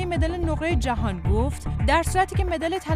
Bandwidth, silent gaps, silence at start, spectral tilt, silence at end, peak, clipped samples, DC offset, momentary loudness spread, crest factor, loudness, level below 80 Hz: 15 kHz; none; 0 s; -6 dB/octave; 0 s; -8 dBFS; under 0.1%; under 0.1%; 5 LU; 16 dB; -24 LUFS; -28 dBFS